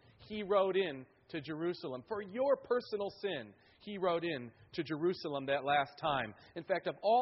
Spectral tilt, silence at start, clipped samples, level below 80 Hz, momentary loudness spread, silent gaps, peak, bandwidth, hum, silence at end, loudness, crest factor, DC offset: -3.5 dB/octave; 0.2 s; under 0.1%; -72 dBFS; 13 LU; none; -18 dBFS; 5.8 kHz; none; 0 s; -36 LUFS; 18 dB; under 0.1%